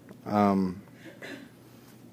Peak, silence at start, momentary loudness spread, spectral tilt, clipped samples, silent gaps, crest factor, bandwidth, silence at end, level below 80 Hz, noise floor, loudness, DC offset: -10 dBFS; 0.05 s; 23 LU; -8 dB/octave; under 0.1%; none; 20 dB; 15.5 kHz; 0.7 s; -70 dBFS; -52 dBFS; -27 LUFS; under 0.1%